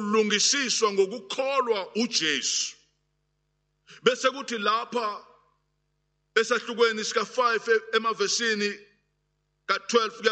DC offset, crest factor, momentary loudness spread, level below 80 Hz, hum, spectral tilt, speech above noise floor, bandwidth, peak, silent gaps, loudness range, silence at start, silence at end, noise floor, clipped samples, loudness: under 0.1%; 22 dB; 8 LU; -78 dBFS; 50 Hz at -65 dBFS; -1.5 dB/octave; 49 dB; 9 kHz; -6 dBFS; none; 4 LU; 0 s; 0 s; -75 dBFS; under 0.1%; -25 LUFS